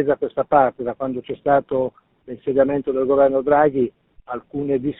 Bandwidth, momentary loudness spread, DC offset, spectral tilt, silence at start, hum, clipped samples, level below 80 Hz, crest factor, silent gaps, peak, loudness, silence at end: 4 kHz; 13 LU; under 0.1%; -6.5 dB/octave; 0 s; none; under 0.1%; -52 dBFS; 18 dB; none; -2 dBFS; -20 LUFS; 0.1 s